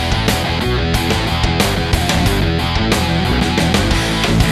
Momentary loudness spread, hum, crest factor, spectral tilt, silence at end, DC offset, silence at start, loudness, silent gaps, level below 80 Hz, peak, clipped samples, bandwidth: 2 LU; none; 14 dB; -4.5 dB/octave; 0 s; under 0.1%; 0 s; -15 LUFS; none; -22 dBFS; 0 dBFS; under 0.1%; 14 kHz